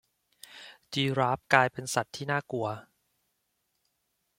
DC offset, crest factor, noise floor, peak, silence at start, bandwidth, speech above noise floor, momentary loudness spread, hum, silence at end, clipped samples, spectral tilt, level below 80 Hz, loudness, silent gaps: under 0.1%; 28 dB; -78 dBFS; -4 dBFS; 0.5 s; 16.5 kHz; 50 dB; 23 LU; none; 1.55 s; under 0.1%; -4.5 dB/octave; -70 dBFS; -29 LUFS; none